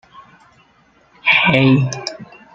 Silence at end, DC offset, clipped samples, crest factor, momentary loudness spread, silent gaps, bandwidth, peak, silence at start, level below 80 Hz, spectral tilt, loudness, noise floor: 0.3 s; under 0.1%; under 0.1%; 18 dB; 17 LU; none; 7.6 kHz; 0 dBFS; 1.25 s; -52 dBFS; -5.5 dB/octave; -14 LUFS; -54 dBFS